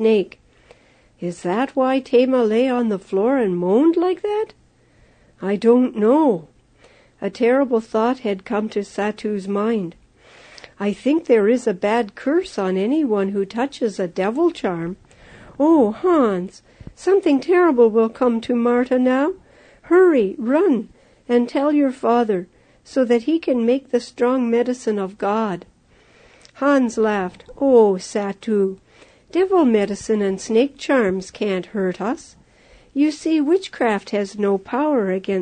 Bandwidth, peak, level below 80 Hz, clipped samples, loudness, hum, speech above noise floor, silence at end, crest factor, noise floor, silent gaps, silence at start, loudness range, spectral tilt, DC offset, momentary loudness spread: 9.6 kHz; -2 dBFS; -58 dBFS; under 0.1%; -19 LUFS; none; 36 dB; 0 s; 16 dB; -54 dBFS; none; 0 s; 4 LU; -6.5 dB/octave; under 0.1%; 10 LU